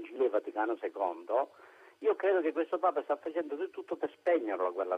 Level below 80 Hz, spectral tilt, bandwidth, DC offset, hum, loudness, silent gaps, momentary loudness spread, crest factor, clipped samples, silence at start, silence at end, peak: -88 dBFS; -5.5 dB/octave; 6.2 kHz; under 0.1%; none; -33 LUFS; none; 8 LU; 16 dB; under 0.1%; 0 s; 0 s; -16 dBFS